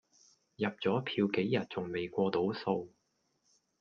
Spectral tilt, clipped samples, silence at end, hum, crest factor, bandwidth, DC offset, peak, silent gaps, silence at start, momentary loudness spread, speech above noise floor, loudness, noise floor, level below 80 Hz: -7.5 dB/octave; under 0.1%; 0.9 s; none; 18 dB; 7 kHz; under 0.1%; -16 dBFS; none; 0.6 s; 6 LU; 45 dB; -34 LUFS; -78 dBFS; -74 dBFS